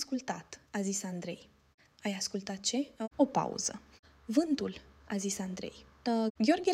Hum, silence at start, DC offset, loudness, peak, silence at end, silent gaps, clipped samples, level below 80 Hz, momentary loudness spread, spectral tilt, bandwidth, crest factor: none; 0 s; under 0.1%; -34 LUFS; -14 dBFS; 0 s; 1.74-1.78 s, 3.99-4.03 s, 6.30-6.35 s; under 0.1%; -68 dBFS; 13 LU; -4 dB/octave; 15.5 kHz; 20 dB